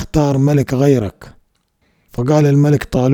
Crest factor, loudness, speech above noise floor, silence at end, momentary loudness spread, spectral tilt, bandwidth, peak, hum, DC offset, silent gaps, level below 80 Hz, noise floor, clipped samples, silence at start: 14 dB; -14 LUFS; 49 dB; 0 s; 10 LU; -8 dB/octave; 16.5 kHz; 0 dBFS; none; under 0.1%; none; -38 dBFS; -62 dBFS; under 0.1%; 0 s